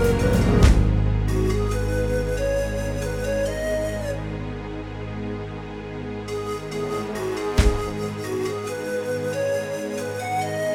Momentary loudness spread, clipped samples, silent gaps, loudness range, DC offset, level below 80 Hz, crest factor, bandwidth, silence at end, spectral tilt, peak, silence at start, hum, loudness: 12 LU; under 0.1%; none; 8 LU; under 0.1%; -28 dBFS; 20 dB; 16.5 kHz; 0 s; -6.5 dB/octave; -2 dBFS; 0 s; none; -25 LUFS